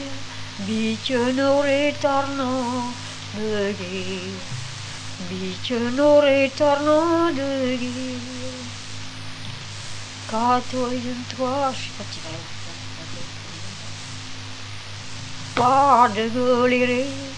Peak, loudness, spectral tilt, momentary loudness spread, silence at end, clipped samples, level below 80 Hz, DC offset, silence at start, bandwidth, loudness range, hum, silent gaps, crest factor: -2 dBFS; -22 LUFS; -4.5 dB/octave; 17 LU; 0 s; under 0.1%; -52 dBFS; 0.5%; 0 s; 10 kHz; 9 LU; 50 Hz at -40 dBFS; none; 20 dB